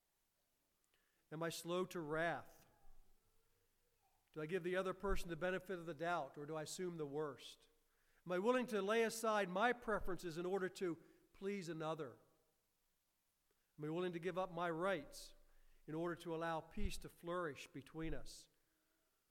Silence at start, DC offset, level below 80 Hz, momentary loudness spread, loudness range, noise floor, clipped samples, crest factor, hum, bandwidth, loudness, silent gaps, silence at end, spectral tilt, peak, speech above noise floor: 1.3 s; under 0.1%; -58 dBFS; 15 LU; 7 LU; -85 dBFS; under 0.1%; 22 dB; none; 17 kHz; -44 LUFS; none; 0.85 s; -5 dB/octave; -24 dBFS; 42 dB